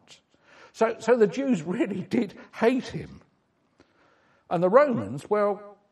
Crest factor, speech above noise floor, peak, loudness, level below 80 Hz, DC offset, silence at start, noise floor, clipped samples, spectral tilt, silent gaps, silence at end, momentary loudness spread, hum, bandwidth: 22 dB; 44 dB; -4 dBFS; -25 LUFS; -66 dBFS; under 0.1%; 0.75 s; -69 dBFS; under 0.1%; -6.5 dB/octave; none; 0.2 s; 14 LU; none; 12 kHz